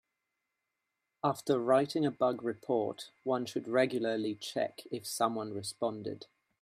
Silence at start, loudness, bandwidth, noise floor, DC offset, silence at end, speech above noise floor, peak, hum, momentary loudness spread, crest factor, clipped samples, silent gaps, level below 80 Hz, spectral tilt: 1.25 s; -33 LUFS; 15.5 kHz; -86 dBFS; under 0.1%; 0.4 s; 53 dB; -14 dBFS; none; 11 LU; 20 dB; under 0.1%; none; -80 dBFS; -5 dB/octave